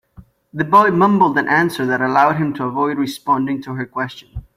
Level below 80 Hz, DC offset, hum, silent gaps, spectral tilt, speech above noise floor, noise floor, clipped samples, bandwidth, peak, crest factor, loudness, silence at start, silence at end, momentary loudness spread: -48 dBFS; under 0.1%; none; none; -6.5 dB/octave; 29 dB; -46 dBFS; under 0.1%; 16.5 kHz; -2 dBFS; 16 dB; -16 LUFS; 0.2 s; 0.15 s; 13 LU